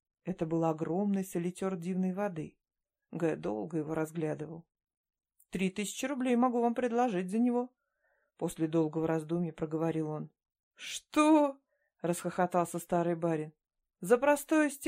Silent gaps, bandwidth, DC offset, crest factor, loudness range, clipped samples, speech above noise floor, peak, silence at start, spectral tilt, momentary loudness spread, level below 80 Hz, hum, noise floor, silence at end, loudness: 4.97-5.04 s, 10.63-10.71 s; 16 kHz; under 0.1%; 18 dB; 5 LU; under 0.1%; 45 dB; -14 dBFS; 0.25 s; -6 dB/octave; 14 LU; -70 dBFS; none; -77 dBFS; 0 s; -32 LUFS